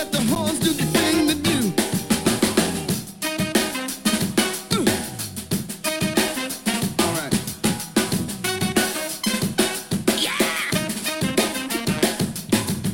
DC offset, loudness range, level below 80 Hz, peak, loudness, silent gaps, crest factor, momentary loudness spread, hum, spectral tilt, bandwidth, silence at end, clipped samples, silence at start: under 0.1%; 2 LU; -50 dBFS; -4 dBFS; -22 LUFS; none; 18 dB; 5 LU; none; -3.5 dB/octave; 17 kHz; 0 s; under 0.1%; 0 s